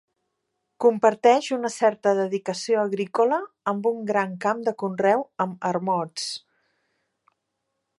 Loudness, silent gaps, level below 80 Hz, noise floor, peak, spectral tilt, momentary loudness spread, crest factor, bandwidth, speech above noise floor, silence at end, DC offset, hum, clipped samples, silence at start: -23 LUFS; none; -78 dBFS; -79 dBFS; -4 dBFS; -5 dB/octave; 9 LU; 20 dB; 11.5 kHz; 56 dB; 1.6 s; under 0.1%; none; under 0.1%; 0.8 s